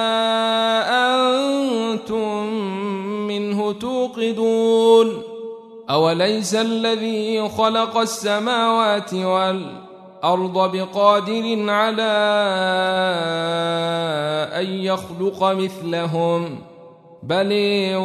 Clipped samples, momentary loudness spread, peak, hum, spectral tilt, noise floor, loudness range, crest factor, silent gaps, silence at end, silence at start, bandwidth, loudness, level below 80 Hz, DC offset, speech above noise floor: under 0.1%; 8 LU; -2 dBFS; none; -4.5 dB/octave; -44 dBFS; 3 LU; 18 dB; none; 0 s; 0 s; 13.5 kHz; -19 LUFS; -66 dBFS; under 0.1%; 25 dB